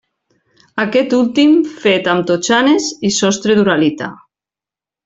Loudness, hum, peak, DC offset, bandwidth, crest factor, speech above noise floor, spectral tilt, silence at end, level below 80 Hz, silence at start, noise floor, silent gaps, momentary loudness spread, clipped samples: -13 LUFS; none; -2 dBFS; under 0.1%; 8 kHz; 12 dB; 76 dB; -4 dB/octave; 0.9 s; -56 dBFS; 0.75 s; -89 dBFS; none; 7 LU; under 0.1%